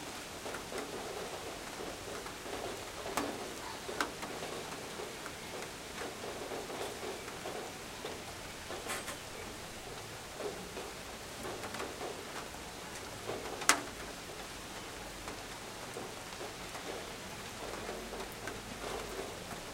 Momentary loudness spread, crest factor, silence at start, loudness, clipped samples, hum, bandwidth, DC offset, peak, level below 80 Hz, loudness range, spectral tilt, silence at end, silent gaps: 6 LU; 36 dB; 0 s; -41 LUFS; under 0.1%; none; 16 kHz; under 0.1%; -6 dBFS; -60 dBFS; 5 LU; -2.5 dB/octave; 0 s; none